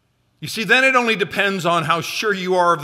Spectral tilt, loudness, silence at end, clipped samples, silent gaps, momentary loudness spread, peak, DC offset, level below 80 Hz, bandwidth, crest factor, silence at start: -4 dB/octave; -17 LUFS; 0 s; under 0.1%; none; 11 LU; -2 dBFS; under 0.1%; -64 dBFS; 16 kHz; 16 dB; 0.4 s